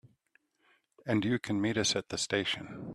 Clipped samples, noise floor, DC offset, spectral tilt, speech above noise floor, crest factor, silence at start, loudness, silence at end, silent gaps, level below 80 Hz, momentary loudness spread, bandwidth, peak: under 0.1%; -72 dBFS; under 0.1%; -3.5 dB/octave; 40 dB; 20 dB; 1.05 s; -31 LUFS; 0 s; none; -66 dBFS; 6 LU; 13 kHz; -14 dBFS